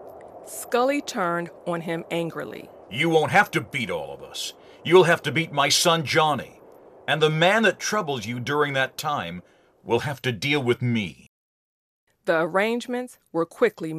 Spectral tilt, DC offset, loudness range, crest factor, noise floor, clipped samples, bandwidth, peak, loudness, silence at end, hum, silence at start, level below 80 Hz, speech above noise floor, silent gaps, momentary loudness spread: -4 dB/octave; under 0.1%; 6 LU; 20 dB; -49 dBFS; under 0.1%; 15 kHz; -4 dBFS; -23 LUFS; 0 s; none; 0 s; -66 dBFS; 25 dB; 11.29-12.07 s; 15 LU